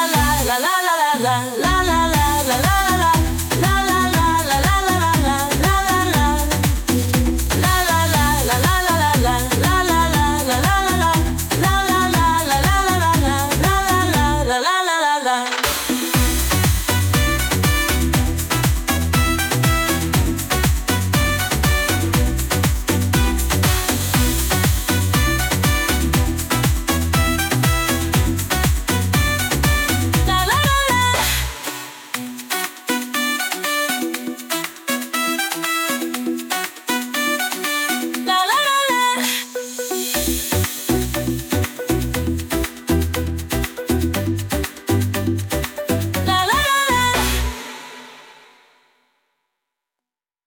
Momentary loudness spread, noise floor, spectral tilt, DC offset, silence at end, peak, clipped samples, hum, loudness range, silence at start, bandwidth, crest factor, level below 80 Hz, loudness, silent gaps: 7 LU; -87 dBFS; -4 dB/octave; under 0.1%; 2.15 s; -4 dBFS; under 0.1%; none; 5 LU; 0 s; 19.5 kHz; 14 dB; -26 dBFS; -18 LUFS; none